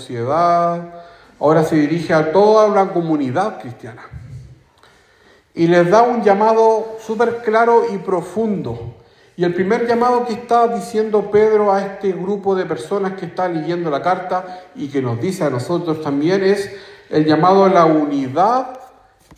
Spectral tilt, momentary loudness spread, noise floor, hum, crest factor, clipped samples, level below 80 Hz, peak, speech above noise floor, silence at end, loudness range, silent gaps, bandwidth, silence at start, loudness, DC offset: -7 dB/octave; 15 LU; -51 dBFS; none; 16 dB; under 0.1%; -54 dBFS; 0 dBFS; 35 dB; 0.55 s; 6 LU; none; 14.5 kHz; 0 s; -16 LUFS; under 0.1%